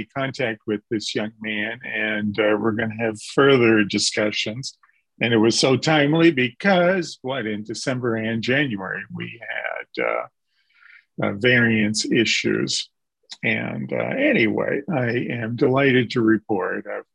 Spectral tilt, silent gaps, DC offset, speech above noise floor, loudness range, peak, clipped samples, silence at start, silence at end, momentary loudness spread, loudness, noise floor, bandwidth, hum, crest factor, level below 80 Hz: -4.5 dB/octave; none; under 0.1%; 36 dB; 6 LU; -4 dBFS; under 0.1%; 0 s; 0.1 s; 11 LU; -21 LUFS; -57 dBFS; 11 kHz; none; 18 dB; -60 dBFS